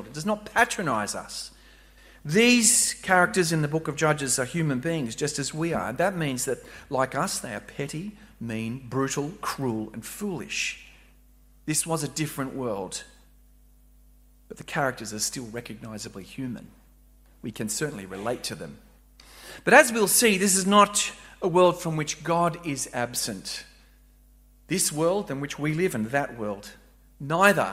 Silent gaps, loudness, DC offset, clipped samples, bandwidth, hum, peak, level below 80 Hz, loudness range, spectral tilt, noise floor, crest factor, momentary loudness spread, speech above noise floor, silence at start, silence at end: none; -25 LUFS; under 0.1%; under 0.1%; 16 kHz; none; 0 dBFS; -56 dBFS; 12 LU; -3.5 dB/octave; -56 dBFS; 26 dB; 18 LU; 30 dB; 0 s; 0 s